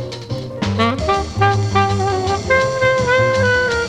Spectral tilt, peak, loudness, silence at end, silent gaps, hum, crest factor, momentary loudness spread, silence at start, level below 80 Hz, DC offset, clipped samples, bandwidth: -5.5 dB/octave; 0 dBFS; -16 LUFS; 0 s; none; none; 16 dB; 8 LU; 0 s; -36 dBFS; under 0.1%; under 0.1%; 10.5 kHz